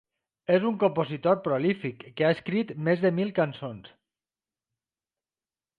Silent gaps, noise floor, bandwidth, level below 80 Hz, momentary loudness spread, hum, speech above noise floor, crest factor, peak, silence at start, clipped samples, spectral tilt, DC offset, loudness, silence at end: none; under -90 dBFS; 5.2 kHz; -70 dBFS; 12 LU; none; over 64 dB; 20 dB; -10 dBFS; 0.5 s; under 0.1%; -9 dB/octave; under 0.1%; -26 LUFS; 1.9 s